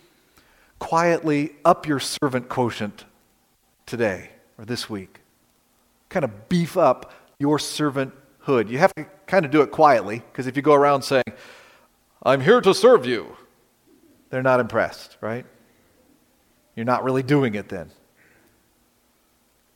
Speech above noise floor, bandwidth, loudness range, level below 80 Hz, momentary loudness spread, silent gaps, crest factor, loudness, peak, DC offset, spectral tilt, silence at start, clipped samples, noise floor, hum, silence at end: 43 dB; 17 kHz; 8 LU; -62 dBFS; 16 LU; none; 22 dB; -21 LUFS; 0 dBFS; under 0.1%; -5.5 dB/octave; 0.8 s; under 0.1%; -64 dBFS; none; 1.9 s